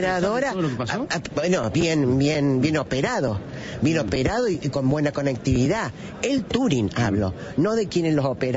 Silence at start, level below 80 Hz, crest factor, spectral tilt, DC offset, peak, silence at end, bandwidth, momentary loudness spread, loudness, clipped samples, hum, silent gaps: 0 s; -44 dBFS; 14 dB; -6 dB/octave; under 0.1%; -8 dBFS; 0 s; 8 kHz; 6 LU; -23 LUFS; under 0.1%; none; none